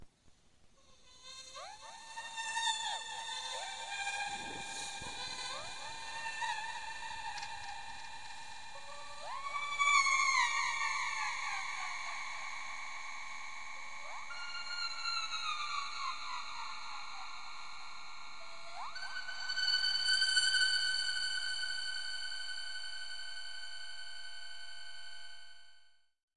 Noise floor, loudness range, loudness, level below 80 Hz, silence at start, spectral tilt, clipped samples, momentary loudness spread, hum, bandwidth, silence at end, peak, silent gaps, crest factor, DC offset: -67 dBFS; 11 LU; -36 LUFS; -70 dBFS; 0 s; 1.5 dB/octave; under 0.1%; 19 LU; none; 11.5 kHz; 0 s; -16 dBFS; 26.23-26.28 s; 22 dB; 0.5%